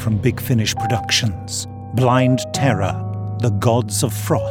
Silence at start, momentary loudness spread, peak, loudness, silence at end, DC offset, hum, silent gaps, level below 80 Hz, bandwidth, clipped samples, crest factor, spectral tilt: 0 s; 9 LU; 0 dBFS; -19 LUFS; 0 s; under 0.1%; none; none; -44 dBFS; 17.5 kHz; under 0.1%; 18 dB; -5 dB/octave